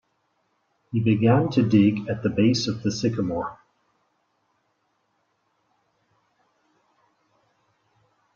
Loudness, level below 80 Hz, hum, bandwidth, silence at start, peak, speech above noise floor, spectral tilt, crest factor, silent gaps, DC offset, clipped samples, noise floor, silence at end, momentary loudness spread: -22 LUFS; -60 dBFS; none; 7.6 kHz; 0.9 s; -6 dBFS; 50 dB; -6.5 dB/octave; 22 dB; none; under 0.1%; under 0.1%; -71 dBFS; 4.8 s; 10 LU